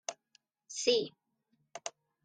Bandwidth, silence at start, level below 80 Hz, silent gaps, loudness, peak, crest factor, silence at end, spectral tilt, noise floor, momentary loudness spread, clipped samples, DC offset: 9.6 kHz; 0.1 s; -84 dBFS; none; -35 LUFS; -16 dBFS; 22 dB; 0.35 s; -1.5 dB/octave; -78 dBFS; 15 LU; under 0.1%; under 0.1%